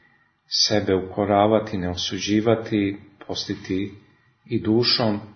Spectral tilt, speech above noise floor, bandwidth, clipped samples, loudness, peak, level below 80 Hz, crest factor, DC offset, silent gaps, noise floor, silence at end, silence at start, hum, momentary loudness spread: -4.5 dB/octave; 38 dB; 6.6 kHz; under 0.1%; -22 LUFS; -4 dBFS; -56 dBFS; 20 dB; under 0.1%; none; -60 dBFS; 0 s; 0.5 s; none; 11 LU